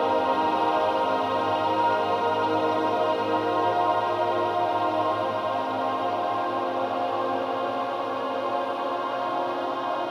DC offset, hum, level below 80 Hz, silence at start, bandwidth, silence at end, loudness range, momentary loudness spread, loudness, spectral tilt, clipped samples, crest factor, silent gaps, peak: under 0.1%; none; -70 dBFS; 0 s; 15.5 kHz; 0 s; 3 LU; 5 LU; -25 LUFS; -5.5 dB/octave; under 0.1%; 12 dB; none; -12 dBFS